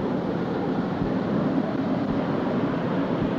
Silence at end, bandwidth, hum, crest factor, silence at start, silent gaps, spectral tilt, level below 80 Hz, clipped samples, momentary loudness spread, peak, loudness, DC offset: 0 s; 7.2 kHz; none; 14 dB; 0 s; none; -9 dB/octave; -50 dBFS; under 0.1%; 2 LU; -12 dBFS; -26 LUFS; under 0.1%